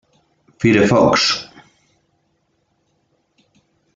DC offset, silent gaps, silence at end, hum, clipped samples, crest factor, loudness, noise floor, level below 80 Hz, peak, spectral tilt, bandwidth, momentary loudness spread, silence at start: under 0.1%; none; 2.5 s; none; under 0.1%; 18 dB; -14 LUFS; -66 dBFS; -52 dBFS; -2 dBFS; -4.5 dB/octave; 9.2 kHz; 11 LU; 0.6 s